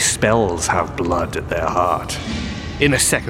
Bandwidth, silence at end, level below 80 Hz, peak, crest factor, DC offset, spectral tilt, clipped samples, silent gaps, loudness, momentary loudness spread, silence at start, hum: 16.5 kHz; 0 s; -34 dBFS; -2 dBFS; 18 dB; under 0.1%; -3.5 dB/octave; under 0.1%; none; -19 LUFS; 10 LU; 0 s; none